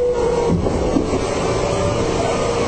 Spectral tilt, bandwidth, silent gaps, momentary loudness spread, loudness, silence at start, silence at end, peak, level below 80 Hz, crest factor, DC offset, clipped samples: -5.5 dB/octave; 11 kHz; none; 2 LU; -19 LUFS; 0 s; 0 s; -4 dBFS; -30 dBFS; 14 dB; under 0.1%; under 0.1%